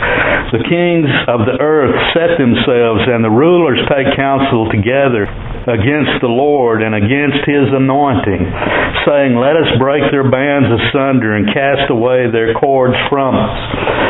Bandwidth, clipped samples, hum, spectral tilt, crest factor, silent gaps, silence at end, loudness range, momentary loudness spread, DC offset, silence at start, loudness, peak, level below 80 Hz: 4.1 kHz; under 0.1%; none; -11 dB/octave; 10 dB; none; 0 s; 2 LU; 3 LU; under 0.1%; 0 s; -12 LUFS; 0 dBFS; -34 dBFS